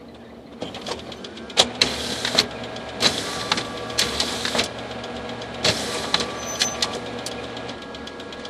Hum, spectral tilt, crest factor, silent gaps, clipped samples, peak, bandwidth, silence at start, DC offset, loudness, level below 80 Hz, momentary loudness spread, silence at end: none; -2 dB/octave; 26 dB; none; under 0.1%; 0 dBFS; 15.5 kHz; 0 s; under 0.1%; -23 LUFS; -48 dBFS; 14 LU; 0 s